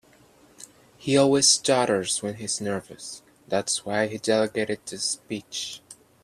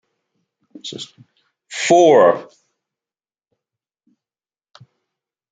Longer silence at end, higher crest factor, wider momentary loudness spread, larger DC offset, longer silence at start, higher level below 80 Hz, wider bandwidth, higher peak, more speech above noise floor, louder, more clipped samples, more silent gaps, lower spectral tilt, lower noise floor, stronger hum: second, 0.3 s vs 3.1 s; about the same, 20 dB vs 20 dB; second, 18 LU vs 23 LU; neither; second, 0.6 s vs 0.85 s; about the same, -66 dBFS vs -70 dBFS; first, 14.5 kHz vs 9.4 kHz; second, -6 dBFS vs -2 dBFS; second, 31 dB vs over 75 dB; second, -24 LUFS vs -13 LUFS; neither; neither; about the same, -3 dB/octave vs -4 dB/octave; second, -56 dBFS vs under -90 dBFS; neither